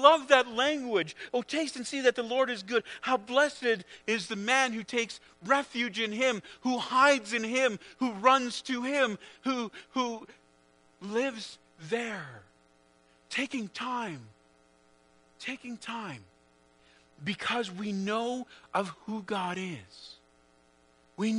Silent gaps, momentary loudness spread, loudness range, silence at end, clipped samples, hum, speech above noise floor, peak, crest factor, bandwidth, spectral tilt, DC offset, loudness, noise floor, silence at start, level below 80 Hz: none; 15 LU; 11 LU; 0 s; under 0.1%; none; 34 dB; -4 dBFS; 26 dB; 10.5 kHz; -3.5 dB/octave; under 0.1%; -30 LUFS; -64 dBFS; 0 s; -74 dBFS